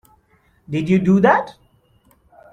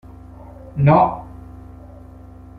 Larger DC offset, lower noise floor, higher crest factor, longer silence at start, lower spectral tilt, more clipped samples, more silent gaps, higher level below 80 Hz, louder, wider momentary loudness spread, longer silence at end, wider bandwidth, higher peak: neither; first, -58 dBFS vs -40 dBFS; about the same, 18 dB vs 20 dB; about the same, 0.7 s vs 0.75 s; second, -8 dB/octave vs -11 dB/octave; neither; neither; second, -54 dBFS vs -42 dBFS; about the same, -17 LUFS vs -16 LUFS; second, 13 LU vs 27 LU; about the same, 1 s vs 1 s; first, 7.6 kHz vs 4.6 kHz; about the same, -2 dBFS vs -2 dBFS